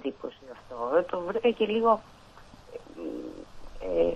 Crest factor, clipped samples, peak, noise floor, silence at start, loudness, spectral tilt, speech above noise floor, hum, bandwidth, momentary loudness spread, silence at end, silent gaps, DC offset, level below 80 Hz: 20 dB; under 0.1%; -10 dBFS; -51 dBFS; 0 s; -28 LUFS; -6.5 dB/octave; 25 dB; none; 8.6 kHz; 21 LU; 0 s; none; under 0.1%; -52 dBFS